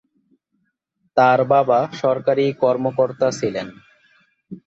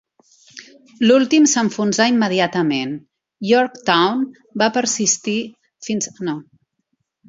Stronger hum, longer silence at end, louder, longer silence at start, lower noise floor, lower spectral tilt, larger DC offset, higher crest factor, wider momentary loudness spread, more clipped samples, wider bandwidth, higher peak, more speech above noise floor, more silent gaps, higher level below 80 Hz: neither; second, 0.1 s vs 0.85 s; about the same, -18 LUFS vs -17 LUFS; first, 1.15 s vs 0.55 s; about the same, -70 dBFS vs -72 dBFS; first, -6 dB/octave vs -3.5 dB/octave; neither; about the same, 16 dB vs 18 dB; second, 9 LU vs 14 LU; neither; about the same, 8 kHz vs 7.8 kHz; second, -4 dBFS vs 0 dBFS; about the same, 53 dB vs 55 dB; neither; about the same, -62 dBFS vs -66 dBFS